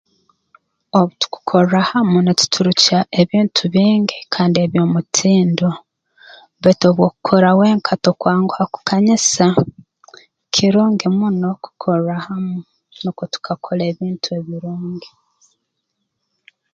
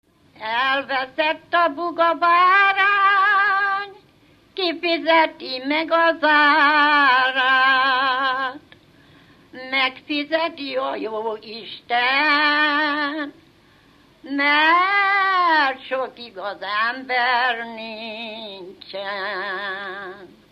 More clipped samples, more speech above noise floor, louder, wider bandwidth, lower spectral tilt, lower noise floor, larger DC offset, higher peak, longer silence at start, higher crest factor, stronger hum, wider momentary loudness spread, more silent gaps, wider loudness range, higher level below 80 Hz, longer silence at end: neither; first, 59 dB vs 34 dB; about the same, -16 LUFS vs -18 LUFS; second, 9 kHz vs 14 kHz; first, -5 dB/octave vs -3.5 dB/octave; first, -74 dBFS vs -54 dBFS; neither; first, 0 dBFS vs -4 dBFS; first, 0.95 s vs 0.4 s; about the same, 16 dB vs 16 dB; neither; second, 12 LU vs 17 LU; neither; about the same, 10 LU vs 8 LU; first, -58 dBFS vs -68 dBFS; first, 1.65 s vs 0.25 s